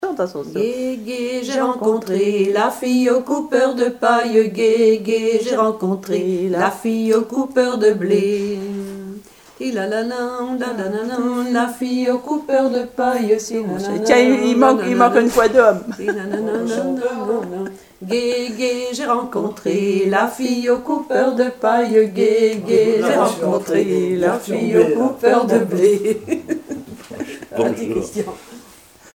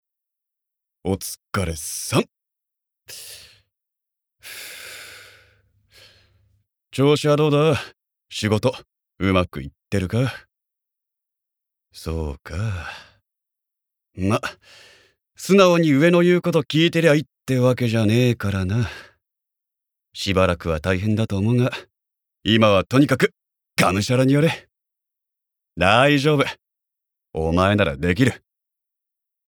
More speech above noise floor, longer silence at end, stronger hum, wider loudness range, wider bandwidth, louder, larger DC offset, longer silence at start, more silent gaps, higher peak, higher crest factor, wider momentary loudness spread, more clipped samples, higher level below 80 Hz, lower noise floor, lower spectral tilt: second, 28 dB vs 65 dB; second, 0.55 s vs 1.1 s; neither; second, 6 LU vs 15 LU; second, 17 kHz vs over 20 kHz; about the same, -18 LUFS vs -20 LUFS; neither; second, 0 s vs 1.05 s; neither; about the same, 0 dBFS vs 0 dBFS; about the same, 18 dB vs 20 dB; second, 10 LU vs 20 LU; neither; second, -56 dBFS vs -46 dBFS; second, -45 dBFS vs -84 dBFS; about the same, -5.5 dB/octave vs -6 dB/octave